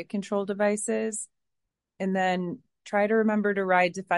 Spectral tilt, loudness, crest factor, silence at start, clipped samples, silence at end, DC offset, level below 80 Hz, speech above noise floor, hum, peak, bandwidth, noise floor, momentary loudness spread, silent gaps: -5 dB/octave; -27 LUFS; 18 dB; 0 s; under 0.1%; 0 s; under 0.1%; -76 dBFS; 57 dB; none; -8 dBFS; 11.5 kHz; -83 dBFS; 12 LU; none